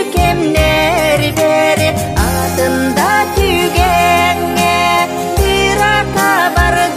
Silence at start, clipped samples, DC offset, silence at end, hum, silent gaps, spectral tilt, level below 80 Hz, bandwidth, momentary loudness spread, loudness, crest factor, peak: 0 s; under 0.1%; 0.7%; 0 s; none; none; -4.5 dB/octave; -24 dBFS; 15.5 kHz; 3 LU; -12 LUFS; 12 dB; 0 dBFS